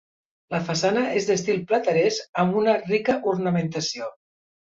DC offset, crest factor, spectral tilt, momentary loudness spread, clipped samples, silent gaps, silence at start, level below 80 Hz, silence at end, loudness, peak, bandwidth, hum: under 0.1%; 16 dB; -5 dB/octave; 7 LU; under 0.1%; 2.29-2.33 s; 0.5 s; -64 dBFS; 0.55 s; -23 LUFS; -8 dBFS; 7.8 kHz; none